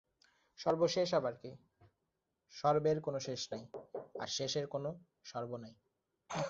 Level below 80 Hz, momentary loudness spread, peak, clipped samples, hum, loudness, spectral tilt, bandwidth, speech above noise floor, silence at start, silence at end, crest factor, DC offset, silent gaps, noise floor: -76 dBFS; 17 LU; -18 dBFS; under 0.1%; none; -37 LUFS; -4.5 dB/octave; 7.6 kHz; 49 dB; 0.6 s; 0 s; 20 dB; under 0.1%; none; -86 dBFS